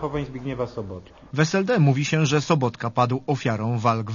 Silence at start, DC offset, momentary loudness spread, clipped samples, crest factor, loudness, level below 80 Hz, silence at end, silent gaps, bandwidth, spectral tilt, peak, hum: 0 s; under 0.1%; 12 LU; under 0.1%; 18 dB; -23 LUFS; -52 dBFS; 0 s; none; 7.4 kHz; -6 dB/octave; -4 dBFS; none